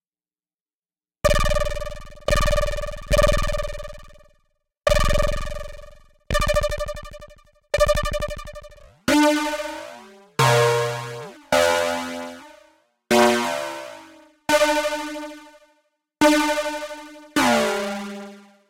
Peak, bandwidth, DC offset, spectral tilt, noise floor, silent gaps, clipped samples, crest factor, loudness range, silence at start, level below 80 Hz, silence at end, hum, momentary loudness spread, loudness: -4 dBFS; 17 kHz; under 0.1%; -4 dB/octave; under -90 dBFS; none; under 0.1%; 20 dB; 4 LU; 1.25 s; -30 dBFS; 0.3 s; none; 19 LU; -22 LUFS